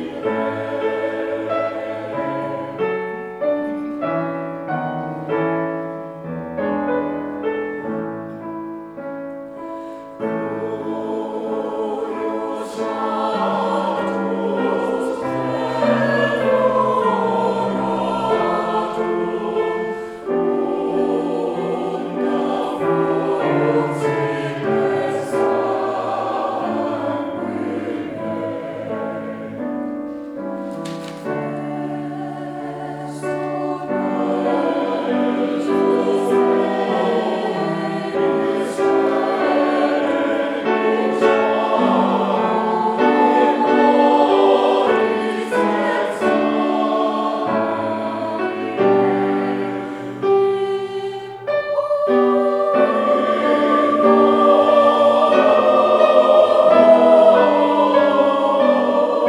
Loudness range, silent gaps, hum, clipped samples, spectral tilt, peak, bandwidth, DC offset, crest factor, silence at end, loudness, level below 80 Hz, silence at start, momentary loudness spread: 13 LU; none; none; under 0.1%; -6.5 dB/octave; 0 dBFS; 11.5 kHz; under 0.1%; 18 dB; 0 s; -18 LUFS; -60 dBFS; 0 s; 13 LU